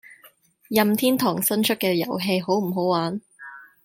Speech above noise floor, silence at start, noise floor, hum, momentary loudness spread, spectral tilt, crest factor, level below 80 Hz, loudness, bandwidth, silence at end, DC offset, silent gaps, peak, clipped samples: 33 dB; 0.1 s; -55 dBFS; none; 14 LU; -4.5 dB/octave; 20 dB; -68 dBFS; -22 LUFS; 17 kHz; 0.2 s; under 0.1%; none; -4 dBFS; under 0.1%